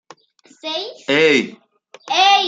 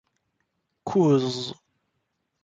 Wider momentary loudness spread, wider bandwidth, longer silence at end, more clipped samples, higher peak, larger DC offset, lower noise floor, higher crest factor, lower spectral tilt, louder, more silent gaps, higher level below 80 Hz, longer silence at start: about the same, 15 LU vs 16 LU; about the same, 9.2 kHz vs 9 kHz; second, 0 s vs 0.9 s; neither; first, 0 dBFS vs -10 dBFS; neither; second, -52 dBFS vs -77 dBFS; about the same, 18 dB vs 18 dB; second, -2.5 dB/octave vs -7 dB/octave; first, -16 LUFS vs -23 LUFS; neither; about the same, -72 dBFS vs -68 dBFS; second, 0.65 s vs 0.85 s